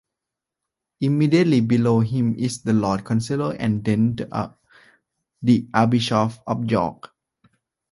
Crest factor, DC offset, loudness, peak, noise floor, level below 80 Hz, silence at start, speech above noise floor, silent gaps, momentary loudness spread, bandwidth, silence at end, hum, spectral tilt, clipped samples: 20 dB; under 0.1%; -21 LUFS; -2 dBFS; -85 dBFS; -54 dBFS; 1 s; 65 dB; none; 9 LU; 11.5 kHz; 0.85 s; none; -7 dB/octave; under 0.1%